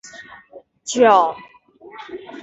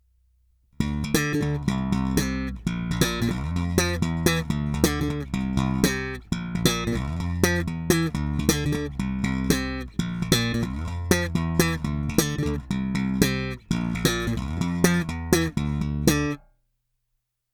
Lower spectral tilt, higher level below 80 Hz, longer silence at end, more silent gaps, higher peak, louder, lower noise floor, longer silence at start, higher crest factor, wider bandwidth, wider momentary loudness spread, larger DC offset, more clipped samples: second, -3 dB/octave vs -5 dB/octave; second, -66 dBFS vs -36 dBFS; second, 0.05 s vs 1.15 s; neither; about the same, -2 dBFS vs 0 dBFS; first, -16 LUFS vs -25 LUFS; second, -45 dBFS vs -77 dBFS; second, 0.15 s vs 0.8 s; second, 18 dB vs 24 dB; second, 8.4 kHz vs 20 kHz; first, 25 LU vs 6 LU; neither; neither